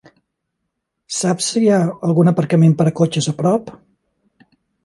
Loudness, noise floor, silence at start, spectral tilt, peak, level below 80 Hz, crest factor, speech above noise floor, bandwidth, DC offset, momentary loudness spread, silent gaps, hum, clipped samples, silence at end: -16 LUFS; -75 dBFS; 1.1 s; -6 dB/octave; 0 dBFS; -60 dBFS; 16 dB; 60 dB; 11.5 kHz; under 0.1%; 6 LU; none; none; under 0.1%; 1.15 s